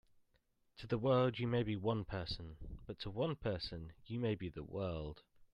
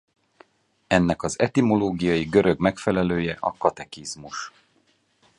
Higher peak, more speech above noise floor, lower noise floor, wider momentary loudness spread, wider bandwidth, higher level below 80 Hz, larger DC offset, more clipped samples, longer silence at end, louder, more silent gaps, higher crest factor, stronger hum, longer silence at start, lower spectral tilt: second, -22 dBFS vs -2 dBFS; second, 38 dB vs 42 dB; first, -77 dBFS vs -65 dBFS; first, 17 LU vs 14 LU; second, 9.6 kHz vs 11.5 kHz; second, -58 dBFS vs -48 dBFS; neither; neither; second, 0.1 s vs 0.9 s; second, -40 LUFS vs -23 LUFS; neither; about the same, 18 dB vs 22 dB; neither; second, 0.75 s vs 0.9 s; first, -8.5 dB/octave vs -6 dB/octave